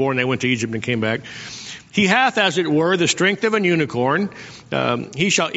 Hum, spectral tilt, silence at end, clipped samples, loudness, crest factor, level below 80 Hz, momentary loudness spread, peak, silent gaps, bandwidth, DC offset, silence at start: none; -3 dB/octave; 0 s; under 0.1%; -19 LUFS; 18 dB; -58 dBFS; 12 LU; -2 dBFS; none; 8 kHz; under 0.1%; 0 s